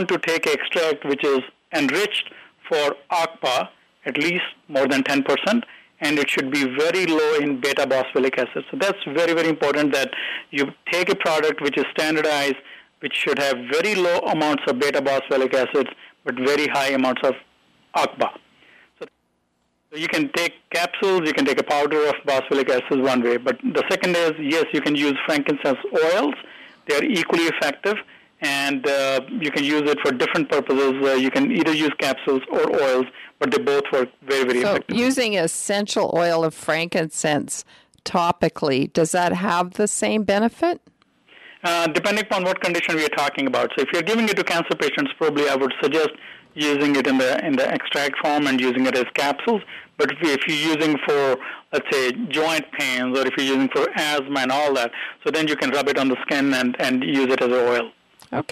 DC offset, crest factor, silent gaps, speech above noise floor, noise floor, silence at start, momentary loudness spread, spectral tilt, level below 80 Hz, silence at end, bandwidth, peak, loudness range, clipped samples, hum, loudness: under 0.1%; 18 dB; none; 48 dB; -69 dBFS; 0 s; 6 LU; -3.5 dB/octave; -66 dBFS; 0.1 s; 15.5 kHz; -4 dBFS; 2 LU; under 0.1%; none; -21 LUFS